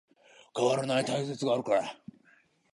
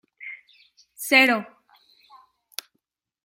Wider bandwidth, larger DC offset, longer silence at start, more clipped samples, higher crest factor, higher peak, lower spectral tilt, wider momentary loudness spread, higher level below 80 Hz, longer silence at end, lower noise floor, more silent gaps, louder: second, 11.5 kHz vs 16.5 kHz; neither; first, 0.55 s vs 0.2 s; neither; about the same, 20 dB vs 24 dB; second, -12 dBFS vs -2 dBFS; first, -5 dB/octave vs -2 dB/octave; second, 13 LU vs 25 LU; about the same, -78 dBFS vs -80 dBFS; second, 0.8 s vs 1.8 s; second, -65 dBFS vs -77 dBFS; neither; second, -30 LUFS vs -18 LUFS